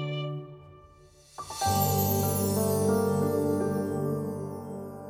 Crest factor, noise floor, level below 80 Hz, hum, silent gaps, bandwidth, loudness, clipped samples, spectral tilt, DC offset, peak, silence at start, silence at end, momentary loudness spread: 18 dB; -55 dBFS; -62 dBFS; none; none; over 20 kHz; -28 LUFS; under 0.1%; -5.5 dB/octave; under 0.1%; -12 dBFS; 0 s; 0 s; 14 LU